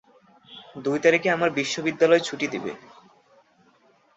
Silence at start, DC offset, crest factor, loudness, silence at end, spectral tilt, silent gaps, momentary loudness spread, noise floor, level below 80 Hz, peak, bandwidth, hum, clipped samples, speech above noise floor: 0.5 s; under 0.1%; 20 dB; -23 LUFS; 1.4 s; -4 dB/octave; none; 20 LU; -60 dBFS; -70 dBFS; -4 dBFS; 8 kHz; none; under 0.1%; 38 dB